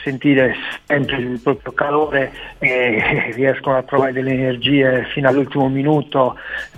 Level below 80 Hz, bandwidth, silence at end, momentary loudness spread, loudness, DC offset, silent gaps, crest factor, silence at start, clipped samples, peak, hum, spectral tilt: -46 dBFS; 8 kHz; 0 s; 5 LU; -17 LUFS; under 0.1%; none; 16 dB; 0 s; under 0.1%; -2 dBFS; none; -7.5 dB/octave